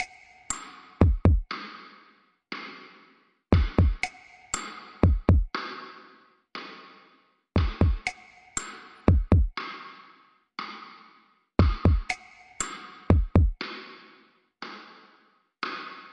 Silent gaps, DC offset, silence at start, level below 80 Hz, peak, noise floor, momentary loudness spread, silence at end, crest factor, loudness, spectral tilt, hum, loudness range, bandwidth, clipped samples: none; under 0.1%; 0 s; -32 dBFS; -8 dBFS; -63 dBFS; 21 LU; 0.1 s; 20 dB; -27 LUFS; -6 dB/octave; none; 3 LU; 10.5 kHz; under 0.1%